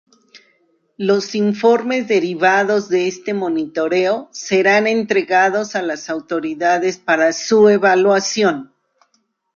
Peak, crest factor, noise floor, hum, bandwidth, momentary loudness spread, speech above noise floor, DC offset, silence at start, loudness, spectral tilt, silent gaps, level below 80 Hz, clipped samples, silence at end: -2 dBFS; 14 dB; -65 dBFS; none; 7.4 kHz; 9 LU; 49 dB; under 0.1%; 0.35 s; -16 LUFS; -4 dB/octave; none; -64 dBFS; under 0.1%; 0.9 s